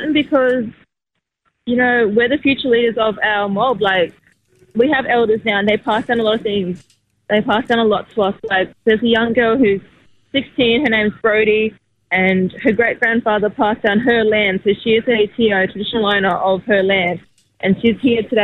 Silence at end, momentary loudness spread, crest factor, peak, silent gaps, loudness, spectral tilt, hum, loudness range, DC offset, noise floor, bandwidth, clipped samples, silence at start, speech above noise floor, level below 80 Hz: 0 s; 7 LU; 14 dB; -2 dBFS; none; -16 LUFS; -7 dB/octave; none; 2 LU; under 0.1%; -76 dBFS; 5.2 kHz; under 0.1%; 0 s; 61 dB; -50 dBFS